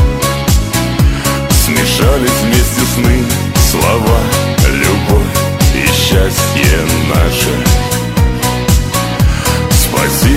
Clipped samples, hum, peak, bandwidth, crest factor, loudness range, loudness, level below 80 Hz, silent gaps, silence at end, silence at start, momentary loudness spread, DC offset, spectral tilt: under 0.1%; none; 0 dBFS; 16.5 kHz; 10 dB; 1 LU; -11 LUFS; -16 dBFS; none; 0 s; 0 s; 3 LU; under 0.1%; -4.5 dB/octave